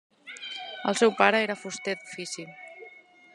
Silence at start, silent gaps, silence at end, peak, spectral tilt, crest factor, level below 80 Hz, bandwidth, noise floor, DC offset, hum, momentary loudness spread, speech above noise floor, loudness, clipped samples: 0.25 s; none; 0.4 s; -4 dBFS; -3 dB/octave; 26 dB; -82 dBFS; 12 kHz; -52 dBFS; under 0.1%; none; 23 LU; 26 dB; -27 LUFS; under 0.1%